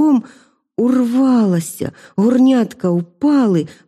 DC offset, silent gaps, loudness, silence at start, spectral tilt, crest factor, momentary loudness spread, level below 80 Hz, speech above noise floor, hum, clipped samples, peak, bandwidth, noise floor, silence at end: under 0.1%; none; -15 LUFS; 0 s; -7 dB/octave; 10 dB; 11 LU; -62 dBFS; 32 dB; none; under 0.1%; -4 dBFS; 13.5 kHz; -47 dBFS; 0.15 s